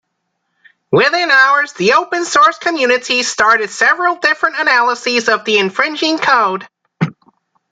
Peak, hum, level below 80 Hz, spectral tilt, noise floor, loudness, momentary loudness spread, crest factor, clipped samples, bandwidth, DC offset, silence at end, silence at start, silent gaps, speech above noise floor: 0 dBFS; none; -62 dBFS; -3 dB/octave; -70 dBFS; -12 LUFS; 6 LU; 14 dB; under 0.1%; 9.4 kHz; under 0.1%; 0.6 s; 0.9 s; none; 57 dB